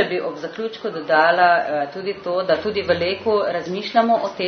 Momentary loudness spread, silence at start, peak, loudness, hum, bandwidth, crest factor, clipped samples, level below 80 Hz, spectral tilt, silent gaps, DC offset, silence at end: 11 LU; 0 s; -2 dBFS; -20 LUFS; none; 6.6 kHz; 18 dB; under 0.1%; -62 dBFS; -5.5 dB/octave; none; under 0.1%; 0 s